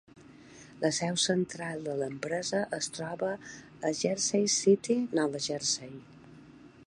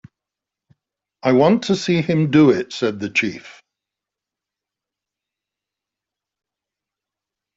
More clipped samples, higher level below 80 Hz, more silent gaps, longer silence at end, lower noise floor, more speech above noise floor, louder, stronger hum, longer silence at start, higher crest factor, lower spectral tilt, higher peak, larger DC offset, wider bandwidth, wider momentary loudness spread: neither; second, -70 dBFS vs -60 dBFS; neither; second, 0.2 s vs 4.05 s; second, -53 dBFS vs -86 dBFS; second, 23 dB vs 69 dB; second, -30 LUFS vs -17 LUFS; neither; second, 0.15 s vs 1.25 s; about the same, 20 dB vs 20 dB; second, -3.5 dB/octave vs -6.5 dB/octave; second, -12 dBFS vs -2 dBFS; neither; first, 11 kHz vs 8 kHz; about the same, 10 LU vs 10 LU